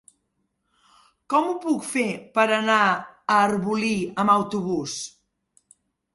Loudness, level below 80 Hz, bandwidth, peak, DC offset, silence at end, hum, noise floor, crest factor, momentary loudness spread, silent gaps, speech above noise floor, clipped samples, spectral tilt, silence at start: -23 LUFS; -66 dBFS; 11.5 kHz; -4 dBFS; under 0.1%; 1.05 s; none; -74 dBFS; 20 dB; 8 LU; none; 52 dB; under 0.1%; -4.5 dB/octave; 1.3 s